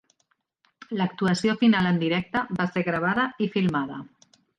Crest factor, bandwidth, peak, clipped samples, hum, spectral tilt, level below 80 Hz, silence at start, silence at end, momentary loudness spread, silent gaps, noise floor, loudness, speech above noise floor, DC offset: 16 dB; 9.6 kHz; -10 dBFS; under 0.1%; none; -6.5 dB/octave; -60 dBFS; 0.9 s; 0.55 s; 9 LU; none; -72 dBFS; -24 LUFS; 48 dB; under 0.1%